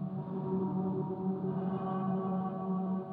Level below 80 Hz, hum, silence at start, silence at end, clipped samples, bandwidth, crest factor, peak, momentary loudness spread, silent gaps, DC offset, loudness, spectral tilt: -72 dBFS; none; 0 s; 0 s; under 0.1%; 3.6 kHz; 12 dB; -22 dBFS; 2 LU; none; under 0.1%; -35 LUFS; -12.5 dB/octave